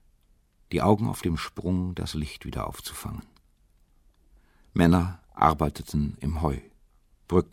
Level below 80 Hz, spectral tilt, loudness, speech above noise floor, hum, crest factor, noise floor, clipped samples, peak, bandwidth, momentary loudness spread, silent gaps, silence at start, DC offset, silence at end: -42 dBFS; -7 dB/octave; -27 LUFS; 37 dB; none; 24 dB; -63 dBFS; under 0.1%; -4 dBFS; 16.5 kHz; 13 LU; none; 0.7 s; under 0.1%; 0.1 s